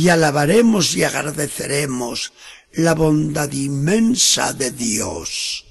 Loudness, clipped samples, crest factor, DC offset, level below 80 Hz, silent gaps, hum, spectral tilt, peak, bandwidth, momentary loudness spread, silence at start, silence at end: -17 LUFS; under 0.1%; 16 dB; under 0.1%; -46 dBFS; none; none; -4 dB/octave; -2 dBFS; 13 kHz; 10 LU; 0 s; 0.1 s